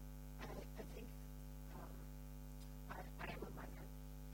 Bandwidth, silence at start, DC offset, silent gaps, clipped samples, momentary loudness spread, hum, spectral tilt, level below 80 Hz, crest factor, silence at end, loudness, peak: 17 kHz; 0 s; under 0.1%; none; under 0.1%; 5 LU; none; -5.5 dB/octave; -54 dBFS; 16 dB; 0 s; -54 LUFS; -36 dBFS